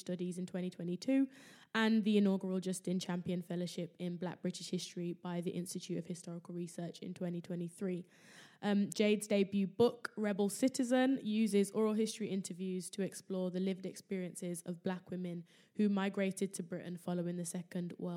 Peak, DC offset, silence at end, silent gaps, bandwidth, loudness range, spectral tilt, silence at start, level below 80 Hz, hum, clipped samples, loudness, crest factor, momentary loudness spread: -18 dBFS; under 0.1%; 0 s; none; 15.5 kHz; 8 LU; -5.5 dB/octave; 0.05 s; -86 dBFS; none; under 0.1%; -37 LUFS; 18 dB; 11 LU